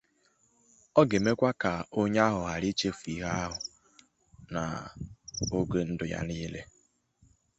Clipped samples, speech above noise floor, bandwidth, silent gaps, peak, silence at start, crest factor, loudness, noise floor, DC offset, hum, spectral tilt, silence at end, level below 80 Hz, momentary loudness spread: under 0.1%; 40 dB; 8.2 kHz; none; -8 dBFS; 0.95 s; 24 dB; -30 LUFS; -69 dBFS; under 0.1%; none; -5.5 dB/octave; 0.95 s; -52 dBFS; 14 LU